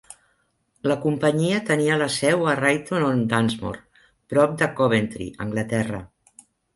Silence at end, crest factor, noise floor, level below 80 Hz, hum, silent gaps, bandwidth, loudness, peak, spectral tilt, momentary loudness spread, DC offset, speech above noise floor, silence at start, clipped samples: 0.7 s; 18 dB; -68 dBFS; -54 dBFS; none; none; 11.5 kHz; -22 LUFS; -4 dBFS; -5.5 dB/octave; 10 LU; under 0.1%; 46 dB; 0.1 s; under 0.1%